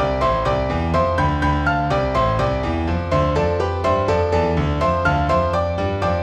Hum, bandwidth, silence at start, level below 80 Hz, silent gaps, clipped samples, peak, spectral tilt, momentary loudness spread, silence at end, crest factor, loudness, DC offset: none; 9 kHz; 0 s; -28 dBFS; none; under 0.1%; -6 dBFS; -7 dB/octave; 3 LU; 0 s; 12 dB; -19 LUFS; under 0.1%